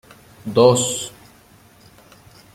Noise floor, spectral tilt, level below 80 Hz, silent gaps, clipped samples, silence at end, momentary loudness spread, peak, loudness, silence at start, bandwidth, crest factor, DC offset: -50 dBFS; -4.5 dB/octave; -56 dBFS; none; under 0.1%; 1.45 s; 19 LU; 0 dBFS; -17 LUFS; 0.45 s; 16 kHz; 22 dB; under 0.1%